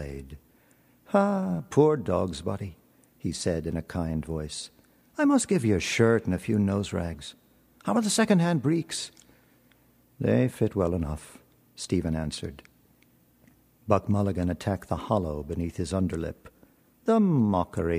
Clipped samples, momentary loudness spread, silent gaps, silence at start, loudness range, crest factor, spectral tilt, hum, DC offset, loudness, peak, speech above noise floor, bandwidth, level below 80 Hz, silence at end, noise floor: under 0.1%; 15 LU; none; 0 s; 5 LU; 22 dB; -6 dB/octave; none; under 0.1%; -27 LUFS; -6 dBFS; 36 dB; 15.5 kHz; -48 dBFS; 0 s; -62 dBFS